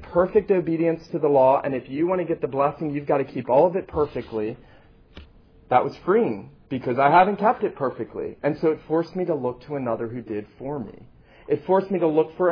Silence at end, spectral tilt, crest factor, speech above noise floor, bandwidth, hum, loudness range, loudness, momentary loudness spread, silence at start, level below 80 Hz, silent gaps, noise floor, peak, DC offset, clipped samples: 0 s; -9.5 dB/octave; 18 dB; 27 dB; 5.4 kHz; none; 5 LU; -23 LUFS; 14 LU; 0 s; -54 dBFS; none; -49 dBFS; -4 dBFS; under 0.1%; under 0.1%